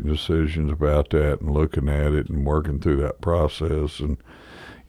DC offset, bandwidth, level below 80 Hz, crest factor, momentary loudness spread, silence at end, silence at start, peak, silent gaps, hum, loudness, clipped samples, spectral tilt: under 0.1%; 11 kHz; -28 dBFS; 14 dB; 7 LU; 0.1 s; 0 s; -8 dBFS; none; none; -23 LUFS; under 0.1%; -8 dB/octave